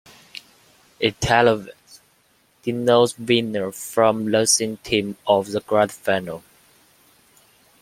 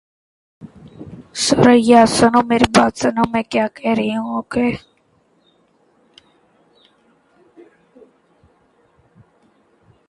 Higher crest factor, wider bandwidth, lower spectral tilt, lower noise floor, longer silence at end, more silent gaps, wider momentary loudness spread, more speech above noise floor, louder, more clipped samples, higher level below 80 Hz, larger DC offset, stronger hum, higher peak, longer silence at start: about the same, 22 dB vs 18 dB; first, 16.5 kHz vs 11.5 kHz; about the same, -3.5 dB/octave vs -4.5 dB/octave; about the same, -61 dBFS vs -59 dBFS; second, 1.45 s vs 5.3 s; neither; about the same, 19 LU vs 20 LU; second, 41 dB vs 45 dB; second, -20 LUFS vs -15 LUFS; neither; about the same, -52 dBFS vs -48 dBFS; neither; neither; about the same, -2 dBFS vs 0 dBFS; second, 0.35 s vs 0.6 s